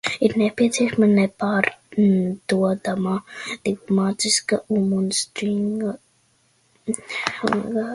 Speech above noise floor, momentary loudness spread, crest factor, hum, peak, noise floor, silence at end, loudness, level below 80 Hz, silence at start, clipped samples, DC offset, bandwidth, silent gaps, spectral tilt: 41 dB; 9 LU; 20 dB; none; -2 dBFS; -62 dBFS; 0 s; -21 LUFS; -60 dBFS; 0.05 s; under 0.1%; under 0.1%; 11.5 kHz; none; -4.5 dB/octave